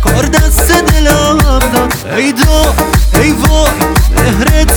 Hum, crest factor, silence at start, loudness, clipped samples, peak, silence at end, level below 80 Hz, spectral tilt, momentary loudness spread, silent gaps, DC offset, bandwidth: none; 8 dB; 0 s; -9 LUFS; 0.2%; 0 dBFS; 0 s; -12 dBFS; -4.5 dB/octave; 3 LU; none; under 0.1%; over 20 kHz